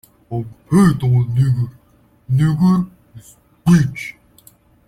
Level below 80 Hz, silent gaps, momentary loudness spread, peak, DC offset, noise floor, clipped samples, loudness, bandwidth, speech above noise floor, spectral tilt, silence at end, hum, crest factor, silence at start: -44 dBFS; none; 14 LU; -2 dBFS; under 0.1%; -50 dBFS; under 0.1%; -17 LUFS; 14 kHz; 35 dB; -8 dB/octave; 0.75 s; none; 16 dB; 0.3 s